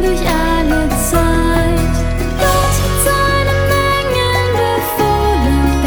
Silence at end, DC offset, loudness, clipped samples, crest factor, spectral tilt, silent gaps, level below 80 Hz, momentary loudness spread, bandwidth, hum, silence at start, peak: 0 s; under 0.1%; -14 LUFS; under 0.1%; 12 dB; -5 dB/octave; none; -20 dBFS; 2 LU; over 20 kHz; none; 0 s; -2 dBFS